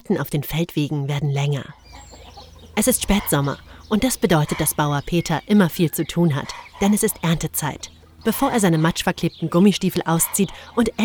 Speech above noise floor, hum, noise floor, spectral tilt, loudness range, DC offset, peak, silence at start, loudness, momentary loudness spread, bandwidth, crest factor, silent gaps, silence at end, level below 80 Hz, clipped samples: 22 dB; none; -42 dBFS; -5 dB/octave; 3 LU; under 0.1%; -2 dBFS; 0.1 s; -20 LUFS; 9 LU; over 20 kHz; 18 dB; none; 0 s; -40 dBFS; under 0.1%